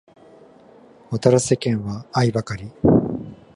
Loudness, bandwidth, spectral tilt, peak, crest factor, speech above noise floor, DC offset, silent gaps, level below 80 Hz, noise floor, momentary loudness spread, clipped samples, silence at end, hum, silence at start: -20 LUFS; 11.5 kHz; -6.5 dB/octave; -2 dBFS; 20 dB; 29 dB; under 0.1%; none; -46 dBFS; -48 dBFS; 12 LU; under 0.1%; 0.2 s; none; 1.1 s